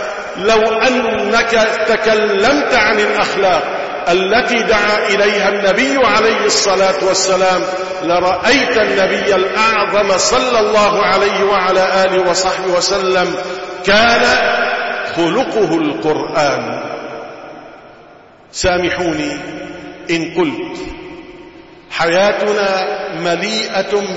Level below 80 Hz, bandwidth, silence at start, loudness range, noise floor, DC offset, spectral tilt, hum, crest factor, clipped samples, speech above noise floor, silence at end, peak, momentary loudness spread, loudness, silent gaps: -42 dBFS; 8 kHz; 0 s; 7 LU; -41 dBFS; 0.3%; -3 dB/octave; none; 14 dB; under 0.1%; 28 dB; 0 s; 0 dBFS; 12 LU; -13 LUFS; none